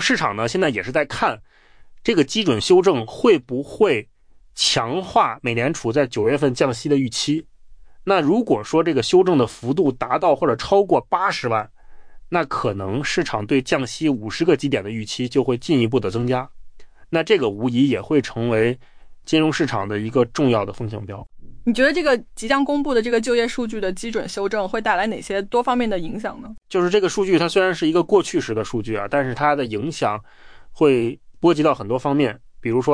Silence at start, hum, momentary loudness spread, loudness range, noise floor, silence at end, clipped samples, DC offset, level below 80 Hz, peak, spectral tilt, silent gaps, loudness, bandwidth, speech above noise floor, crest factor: 0 s; none; 8 LU; 3 LU; -42 dBFS; 0 s; under 0.1%; under 0.1%; -48 dBFS; -4 dBFS; -5 dB/octave; none; -20 LUFS; 10.5 kHz; 23 dB; 16 dB